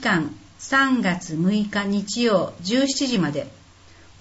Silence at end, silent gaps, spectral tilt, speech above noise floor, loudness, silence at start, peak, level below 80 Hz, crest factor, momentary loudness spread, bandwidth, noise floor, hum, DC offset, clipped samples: 0.7 s; none; -4.5 dB/octave; 27 dB; -22 LUFS; 0 s; -6 dBFS; -56 dBFS; 16 dB; 10 LU; 8 kHz; -49 dBFS; none; under 0.1%; under 0.1%